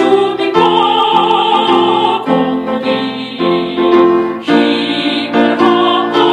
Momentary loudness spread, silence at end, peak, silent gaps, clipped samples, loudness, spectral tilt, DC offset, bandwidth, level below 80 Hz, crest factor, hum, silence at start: 6 LU; 0 s; 0 dBFS; none; under 0.1%; -11 LUFS; -5.5 dB/octave; under 0.1%; 9.4 kHz; -54 dBFS; 12 dB; none; 0 s